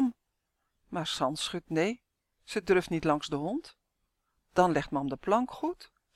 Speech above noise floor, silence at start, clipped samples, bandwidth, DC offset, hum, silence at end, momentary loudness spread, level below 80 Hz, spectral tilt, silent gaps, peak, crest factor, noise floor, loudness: 51 dB; 0 s; under 0.1%; 14 kHz; under 0.1%; none; 0.3 s; 10 LU; -60 dBFS; -5 dB/octave; none; -10 dBFS; 22 dB; -81 dBFS; -31 LUFS